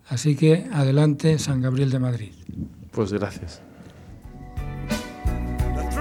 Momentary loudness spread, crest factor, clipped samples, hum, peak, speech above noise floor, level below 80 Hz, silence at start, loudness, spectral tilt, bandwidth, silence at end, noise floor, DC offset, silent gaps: 20 LU; 18 dB; under 0.1%; none; -6 dBFS; 22 dB; -34 dBFS; 0.1 s; -23 LUFS; -7 dB/octave; 14.5 kHz; 0 s; -43 dBFS; under 0.1%; none